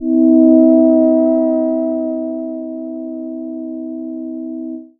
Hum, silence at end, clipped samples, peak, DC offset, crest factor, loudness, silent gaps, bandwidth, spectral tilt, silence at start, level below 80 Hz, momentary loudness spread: none; 0.15 s; under 0.1%; 0 dBFS; under 0.1%; 14 dB; -13 LUFS; none; 2 kHz; -13 dB/octave; 0 s; -58 dBFS; 16 LU